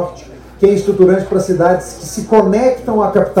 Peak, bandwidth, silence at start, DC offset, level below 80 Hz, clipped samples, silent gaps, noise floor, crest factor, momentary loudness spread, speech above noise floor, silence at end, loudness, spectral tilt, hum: 0 dBFS; 15.5 kHz; 0 s; under 0.1%; -40 dBFS; 0.5%; none; -34 dBFS; 12 dB; 9 LU; 22 dB; 0 s; -13 LUFS; -6.5 dB/octave; none